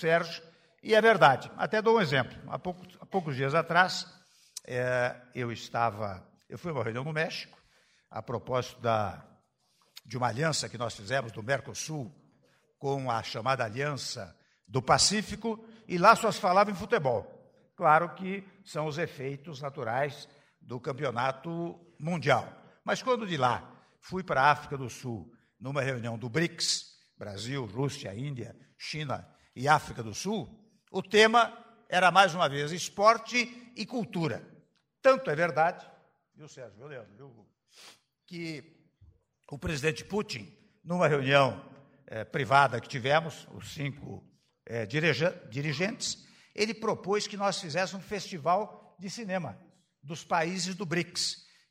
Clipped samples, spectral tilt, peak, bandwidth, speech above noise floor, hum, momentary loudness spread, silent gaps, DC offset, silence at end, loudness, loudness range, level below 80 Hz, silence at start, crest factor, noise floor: under 0.1%; -4 dB/octave; -6 dBFS; 16 kHz; 41 dB; none; 19 LU; none; under 0.1%; 0.3 s; -29 LUFS; 8 LU; -64 dBFS; 0 s; 24 dB; -71 dBFS